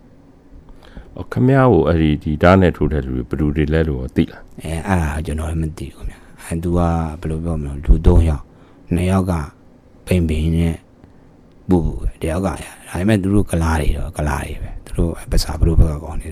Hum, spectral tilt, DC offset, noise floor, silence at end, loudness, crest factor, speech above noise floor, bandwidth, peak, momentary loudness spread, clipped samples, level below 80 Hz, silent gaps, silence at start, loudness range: none; -7.5 dB/octave; under 0.1%; -46 dBFS; 0 s; -18 LUFS; 16 dB; 29 dB; 15 kHz; 0 dBFS; 16 LU; under 0.1%; -24 dBFS; none; 0.55 s; 6 LU